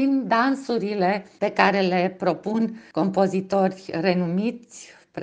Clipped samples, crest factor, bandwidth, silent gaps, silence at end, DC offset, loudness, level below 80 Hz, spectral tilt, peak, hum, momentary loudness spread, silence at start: under 0.1%; 22 dB; 9.2 kHz; none; 0 s; under 0.1%; -23 LUFS; -68 dBFS; -6.5 dB/octave; 0 dBFS; none; 8 LU; 0 s